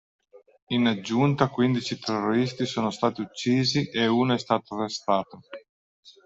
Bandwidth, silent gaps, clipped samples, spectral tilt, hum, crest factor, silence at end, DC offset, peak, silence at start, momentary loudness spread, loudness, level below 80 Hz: 8 kHz; 0.62-0.67 s, 5.69-6.03 s; under 0.1%; -5.5 dB/octave; none; 20 dB; 0.15 s; under 0.1%; -6 dBFS; 0.35 s; 7 LU; -25 LUFS; -64 dBFS